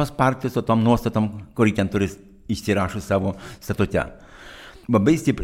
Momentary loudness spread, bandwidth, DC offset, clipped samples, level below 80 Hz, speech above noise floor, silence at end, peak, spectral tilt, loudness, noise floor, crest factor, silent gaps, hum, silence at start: 17 LU; 16.5 kHz; under 0.1%; under 0.1%; -44 dBFS; 21 dB; 0 s; -4 dBFS; -7 dB/octave; -22 LUFS; -42 dBFS; 18 dB; none; none; 0 s